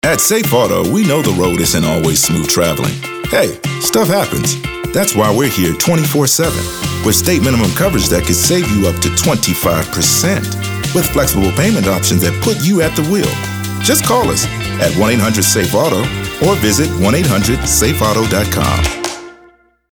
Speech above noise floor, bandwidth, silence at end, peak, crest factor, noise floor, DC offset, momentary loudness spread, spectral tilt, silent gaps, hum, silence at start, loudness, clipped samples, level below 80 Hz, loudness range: 35 dB; over 20 kHz; 0.6 s; 0 dBFS; 12 dB; -47 dBFS; under 0.1%; 6 LU; -4 dB/octave; none; none; 0.05 s; -13 LUFS; under 0.1%; -32 dBFS; 1 LU